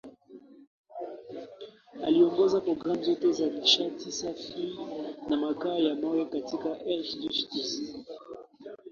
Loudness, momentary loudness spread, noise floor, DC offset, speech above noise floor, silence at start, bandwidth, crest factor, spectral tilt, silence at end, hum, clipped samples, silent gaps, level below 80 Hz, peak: -29 LUFS; 21 LU; -52 dBFS; under 0.1%; 23 dB; 0.05 s; 7.2 kHz; 20 dB; -4 dB/octave; 0 s; none; under 0.1%; 0.67-0.84 s; -70 dBFS; -10 dBFS